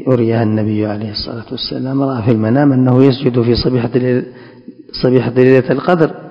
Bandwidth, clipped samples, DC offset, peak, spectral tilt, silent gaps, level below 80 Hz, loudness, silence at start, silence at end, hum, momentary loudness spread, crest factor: 5.6 kHz; 0.5%; under 0.1%; 0 dBFS; -9.5 dB/octave; none; -38 dBFS; -13 LUFS; 0 s; 0 s; none; 11 LU; 14 dB